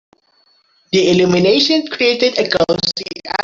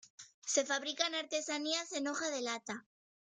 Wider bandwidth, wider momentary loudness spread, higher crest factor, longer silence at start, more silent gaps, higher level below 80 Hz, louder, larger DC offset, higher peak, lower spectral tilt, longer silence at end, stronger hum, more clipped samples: second, 7.6 kHz vs 10 kHz; second, 7 LU vs 13 LU; second, 14 dB vs 22 dB; first, 0.9 s vs 0.05 s; second, none vs 0.10-0.18 s, 0.34-0.42 s; first, -52 dBFS vs -88 dBFS; first, -14 LUFS vs -36 LUFS; neither; first, 0 dBFS vs -18 dBFS; first, -4.5 dB/octave vs -0.5 dB/octave; second, 0 s vs 0.55 s; neither; neither